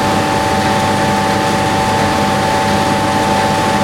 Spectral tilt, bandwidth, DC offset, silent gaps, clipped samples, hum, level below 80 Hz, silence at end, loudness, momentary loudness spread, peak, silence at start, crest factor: -4.5 dB/octave; 19 kHz; under 0.1%; none; under 0.1%; 50 Hz at -25 dBFS; -36 dBFS; 0 s; -13 LUFS; 1 LU; -2 dBFS; 0 s; 12 dB